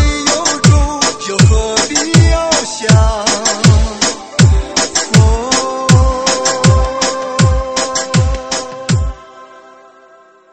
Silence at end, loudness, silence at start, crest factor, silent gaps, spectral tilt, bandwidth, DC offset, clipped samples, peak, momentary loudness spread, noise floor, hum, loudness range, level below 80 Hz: 0.95 s; -12 LUFS; 0 s; 12 dB; none; -4 dB/octave; 8.8 kHz; 0.6%; under 0.1%; 0 dBFS; 6 LU; -44 dBFS; none; 4 LU; -20 dBFS